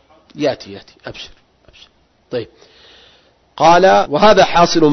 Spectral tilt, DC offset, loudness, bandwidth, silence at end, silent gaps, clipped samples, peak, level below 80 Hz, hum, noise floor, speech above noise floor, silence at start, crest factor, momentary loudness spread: -4.5 dB/octave; under 0.1%; -11 LUFS; 6.4 kHz; 0 s; none; under 0.1%; 0 dBFS; -42 dBFS; none; -52 dBFS; 39 dB; 0.35 s; 16 dB; 24 LU